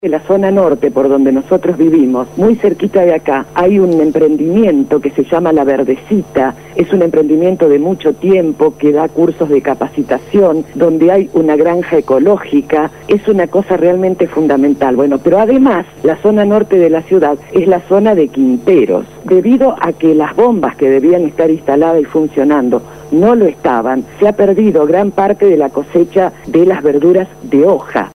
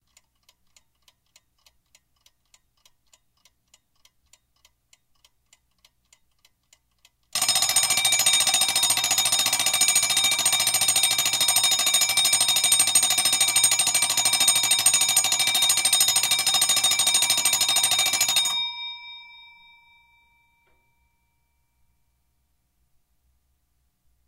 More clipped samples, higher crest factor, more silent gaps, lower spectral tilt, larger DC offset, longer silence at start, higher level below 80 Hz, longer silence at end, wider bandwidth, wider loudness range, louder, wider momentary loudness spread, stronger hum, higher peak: neither; second, 10 dB vs 22 dB; neither; first, -8 dB/octave vs 2 dB/octave; first, 0.3% vs under 0.1%; second, 0.05 s vs 7.35 s; first, -46 dBFS vs -66 dBFS; second, 0.05 s vs 5.05 s; second, 14.5 kHz vs 16.5 kHz; second, 1 LU vs 8 LU; first, -11 LUFS vs -18 LUFS; about the same, 5 LU vs 3 LU; neither; first, 0 dBFS vs -4 dBFS